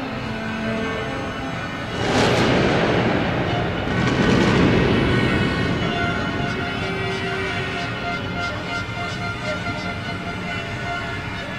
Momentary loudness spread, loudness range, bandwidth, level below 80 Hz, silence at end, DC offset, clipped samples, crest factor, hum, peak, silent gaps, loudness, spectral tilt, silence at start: 10 LU; 7 LU; 14 kHz; -38 dBFS; 0 s; under 0.1%; under 0.1%; 18 dB; none; -4 dBFS; none; -22 LUFS; -6 dB/octave; 0 s